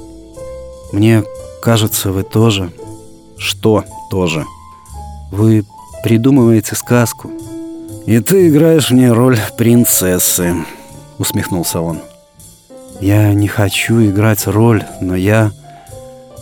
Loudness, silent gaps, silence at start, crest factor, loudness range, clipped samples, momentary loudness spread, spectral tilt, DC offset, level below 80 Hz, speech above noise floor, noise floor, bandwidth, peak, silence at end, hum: -12 LUFS; none; 0 s; 12 dB; 6 LU; under 0.1%; 20 LU; -5.5 dB/octave; under 0.1%; -42 dBFS; 30 dB; -41 dBFS; over 20 kHz; 0 dBFS; 0 s; none